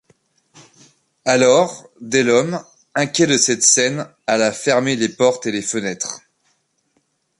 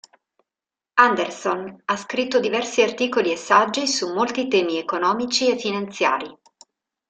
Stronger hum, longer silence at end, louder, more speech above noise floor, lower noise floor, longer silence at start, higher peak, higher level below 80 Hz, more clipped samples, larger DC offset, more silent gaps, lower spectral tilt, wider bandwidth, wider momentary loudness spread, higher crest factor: neither; first, 1.2 s vs 0.75 s; first, -17 LUFS vs -21 LUFS; second, 49 dB vs 69 dB; second, -66 dBFS vs -89 dBFS; first, 1.25 s vs 0.95 s; about the same, 0 dBFS vs -2 dBFS; first, -62 dBFS vs -68 dBFS; neither; neither; neither; about the same, -3 dB/octave vs -2.5 dB/octave; first, 11.5 kHz vs 9.4 kHz; first, 13 LU vs 9 LU; about the same, 18 dB vs 20 dB